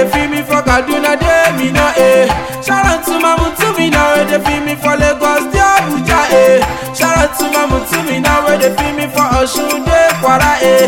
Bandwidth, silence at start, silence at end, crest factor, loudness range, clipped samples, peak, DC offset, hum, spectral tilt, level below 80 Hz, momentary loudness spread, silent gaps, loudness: 17.5 kHz; 0 s; 0 s; 10 dB; 1 LU; under 0.1%; 0 dBFS; 0.5%; none; -4 dB/octave; -26 dBFS; 5 LU; none; -11 LUFS